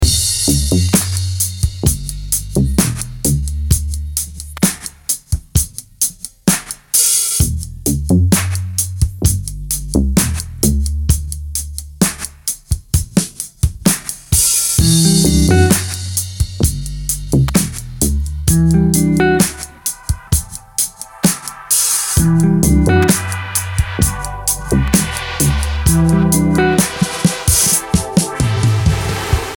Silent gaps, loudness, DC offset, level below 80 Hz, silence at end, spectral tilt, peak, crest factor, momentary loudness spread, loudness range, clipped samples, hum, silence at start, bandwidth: none; -15 LUFS; under 0.1%; -24 dBFS; 0 s; -4 dB/octave; 0 dBFS; 16 dB; 9 LU; 5 LU; under 0.1%; none; 0 s; over 20 kHz